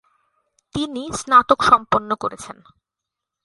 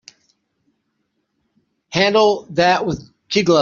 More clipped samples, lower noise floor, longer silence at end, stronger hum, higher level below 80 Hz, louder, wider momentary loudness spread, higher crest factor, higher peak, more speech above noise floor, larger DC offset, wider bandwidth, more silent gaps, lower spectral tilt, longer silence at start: neither; first, -85 dBFS vs -71 dBFS; first, 0.9 s vs 0 s; neither; about the same, -50 dBFS vs -52 dBFS; about the same, -18 LUFS vs -17 LUFS; first, 17 LU vs 11 LU; about the same, 20 dB vs 18 dB; about the same, 0 dBFS vs -2 dBFS; first, 66 dB vs 55 dB; neither; first, 11.5 kHz vs 7.4 kHz; neither; about the same, -3.5 dB/octave vs -3 dB/octave; second, 0.75 s vs 1.9 s